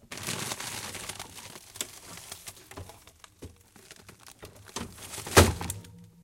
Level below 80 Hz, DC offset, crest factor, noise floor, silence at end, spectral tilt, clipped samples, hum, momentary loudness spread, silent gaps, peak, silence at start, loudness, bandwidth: -46 dBFS; under 0.1%; 32 dB; -55 dBFS; 0.15 s; -3.5 dB/octave; under 0.1%; none; 27 LU; none; 0 dBFS; 0.1 s; -29 LUFS; 17 kHz